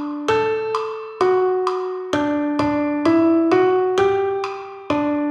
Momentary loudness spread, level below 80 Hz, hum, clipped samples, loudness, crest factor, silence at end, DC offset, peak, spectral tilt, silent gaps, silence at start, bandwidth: 9 LU; -54 dBFS; none; under 0.1%; -19 LUFS; 14 dB; 0 s; under 0.1%; -4 dBFS; -6 dB/octave; none; 0 s; 9.4 kHz